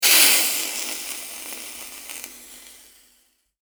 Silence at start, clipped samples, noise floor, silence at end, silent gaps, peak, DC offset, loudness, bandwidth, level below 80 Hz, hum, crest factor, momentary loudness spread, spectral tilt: 0 s; under 0.1%; -63 dBFS; 0.9 s; none; 0 dBFS; under 0.1%; -18 LUFS; over 20 kHz; -66 dBFS; none; 24 dB; 26 LU; 3 dB/octave